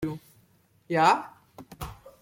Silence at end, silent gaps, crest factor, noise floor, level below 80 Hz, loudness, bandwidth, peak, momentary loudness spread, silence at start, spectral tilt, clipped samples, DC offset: 0.15 s; none; 22 dB; -63 dBFS; -54 dBFS; -25 LUFS; 16.5 kHz; -8 dBFS; 21 LU; 0 s; -5 dB/octave; under 0.1%; under 0.1%